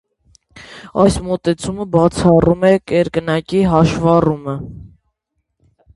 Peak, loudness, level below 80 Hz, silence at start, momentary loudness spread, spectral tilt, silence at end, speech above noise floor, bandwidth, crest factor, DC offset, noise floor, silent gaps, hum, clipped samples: 0 dBFS; -15 LUFS; -38 dBFS; 0.55 s; 13 LU; -7 dB/octave; 1.1 s; 57 dB; 11.5 kHz; 16 dB; under 0.1%; -72 dBFS; none; none; under 0.1%